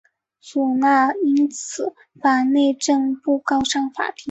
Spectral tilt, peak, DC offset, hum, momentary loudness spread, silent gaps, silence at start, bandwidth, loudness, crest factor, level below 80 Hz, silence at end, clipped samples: -2.5 dB/octave; -4 dBFS; under 0.1%; none; 10 LU; none; 0.45 s; 8.2 kHz; -20 LUFS; 16 dB; -58 dBFS; 0 s; under 0.1%